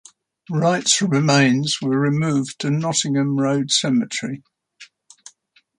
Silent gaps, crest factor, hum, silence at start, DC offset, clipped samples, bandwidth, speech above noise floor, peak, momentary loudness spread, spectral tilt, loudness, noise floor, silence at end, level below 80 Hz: none; 18 dB; none; 0.5 s; under 0.1%; under 0.1%; 11 kHz; 39 dB; -4 dBFS; 10 LU; -4 dB/octave; -19 LUFS; -58 dBFS; 0.95 s; -64 dBFS